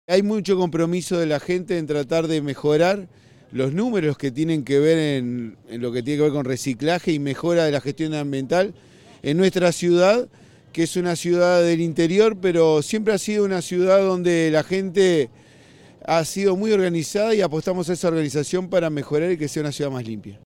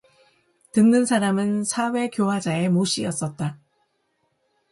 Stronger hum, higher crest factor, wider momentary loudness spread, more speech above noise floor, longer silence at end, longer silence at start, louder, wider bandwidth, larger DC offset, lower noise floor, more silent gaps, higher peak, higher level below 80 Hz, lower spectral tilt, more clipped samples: neither; about the same, 16 dB vs 16 dB; about the same, 8 LU vs 10 LU; second, 28 dB vs 50 dB; second, 0.1 s vs 1.15 s; second, 0.1 s vs 0.75 s; about the same, -21 LUFS vs -22 LUFS; first, 16.5 kHz vs 11.5 kHz; neither; second, -49 dBFS vs -71 dBFS; neither; first, -4 dBFS vs -8 dBFS; first, -60 dBFS vs -66 dBFS; about the same, -5.5 dB/octave vs -5 dB/octave; neither